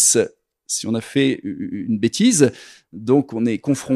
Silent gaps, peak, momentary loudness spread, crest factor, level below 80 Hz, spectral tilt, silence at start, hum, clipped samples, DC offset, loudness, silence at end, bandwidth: none; 0 dBFS; 12 LU; 20 dB; -62 dBFS; -4 dB/octave; 0 s; none; under 0.1%; under 0.1%; -19 LUFS; 0 s; 13.5 kHz